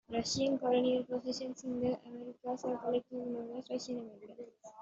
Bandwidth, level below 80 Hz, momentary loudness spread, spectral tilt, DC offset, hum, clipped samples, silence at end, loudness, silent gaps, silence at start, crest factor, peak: 8 kHz; -72 dBFS; 18 LU; -4.5 dB/octave; under 0.1%; none; under 0.1%; 0 s; -36 LUFS; none; 0.1 s; 16 dB; -20 dBFS